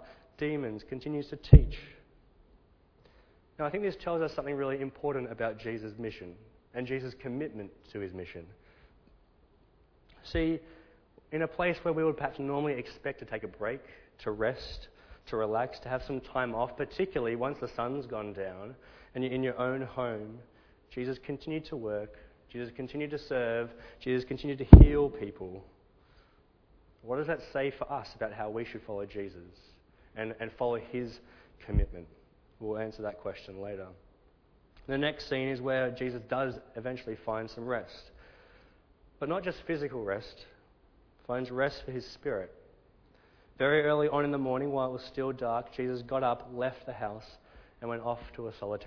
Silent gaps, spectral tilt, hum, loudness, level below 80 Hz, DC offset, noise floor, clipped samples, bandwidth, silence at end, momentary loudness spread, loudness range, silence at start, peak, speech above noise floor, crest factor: none; -7 dB/octave; none; -31 LUFS; -36 dBFS; under 0.1%; -64 dBFS; under 0.1%; 5.4 kHz; 0 s; 13 LU; 15 LU; 0 s; 0 dBFS; 34 dB; 32 dB